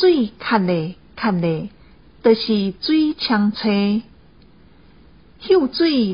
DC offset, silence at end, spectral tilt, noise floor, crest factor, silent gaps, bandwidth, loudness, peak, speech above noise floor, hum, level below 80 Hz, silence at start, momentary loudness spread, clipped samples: 0.2%; 0 s; -10.5 dB/octave; -49 dBFS; 18 dB; none; 5.4 kHz; -19 LUFS; -2 dBFS; 32 dB; none; -52 dBFS; 0 s; 8 LU; under 0.1%